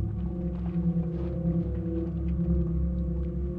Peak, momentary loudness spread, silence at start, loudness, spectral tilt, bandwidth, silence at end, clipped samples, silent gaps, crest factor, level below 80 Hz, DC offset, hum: -16 dBFS; 4 LU; 0 s; -30 LUFS; -12.5 dB/octave; 3.1 kHz; 0 s; under 0.1%; none; 12 dB; -34 dBFS; under 0.1%; none